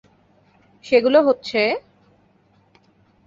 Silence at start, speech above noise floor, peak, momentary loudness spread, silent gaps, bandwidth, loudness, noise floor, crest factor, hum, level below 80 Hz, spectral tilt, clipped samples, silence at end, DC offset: 0.85 s; 41 dB; -2 dBFS; 7 LU; none; 7.6 kHz; -18 LUFS; -58 dBFS; 20 dB; none; -64 dBFS; -5 dB/octave; under 0.1%; 1.45 s; under 0.1%